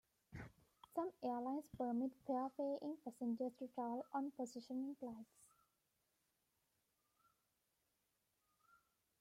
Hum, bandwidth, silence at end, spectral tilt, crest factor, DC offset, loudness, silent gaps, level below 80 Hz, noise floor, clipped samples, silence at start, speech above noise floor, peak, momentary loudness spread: none; 15.5 kHz; 3.75 s; -6.5 dB/octave; 18 dB; under 0.1%; -46 LUFS; none; -80 dBFS; -86 dBFS; under 0.1%; 0.3 s; 41 dB; -32 dBFS; 14 LU